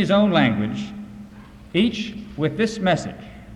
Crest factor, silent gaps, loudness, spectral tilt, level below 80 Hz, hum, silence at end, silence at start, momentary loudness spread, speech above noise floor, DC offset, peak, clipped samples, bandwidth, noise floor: 18 dB; none; -22 LUFS; -6 dB/octave; -48 dBFS; none; 0 s; 0 s; 22 LU; 21 dB; under 0.1%; -4 dBFS; under 0.1%; 10.5 kHz; -42 dBFS